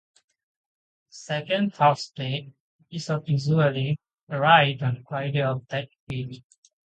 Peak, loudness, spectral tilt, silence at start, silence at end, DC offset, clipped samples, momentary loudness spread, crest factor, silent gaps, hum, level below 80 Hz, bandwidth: -4 dBFS; -24 LUFS; -6 dB/octave; 1.15 s; 0.45 s; under 0.1%; under 0.1%; 16 LU; 22 dB; 2.60-2.79 s, 4.23-4.27 s, 6.00-6.07 s; none; -64 dBFS; 8.8 kHz